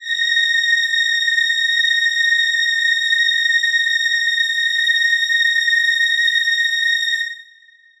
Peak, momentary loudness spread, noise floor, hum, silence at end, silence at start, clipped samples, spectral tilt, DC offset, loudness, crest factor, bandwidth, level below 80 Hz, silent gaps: -6 dBFS; 2 LU; -49 dBFS; none; 0.55 s; 0 s; under 0.1%; 7 dB/octave; under 0.1%; -14 LUFS; 12 dB; 15.5 kHz; -66 dBFS; none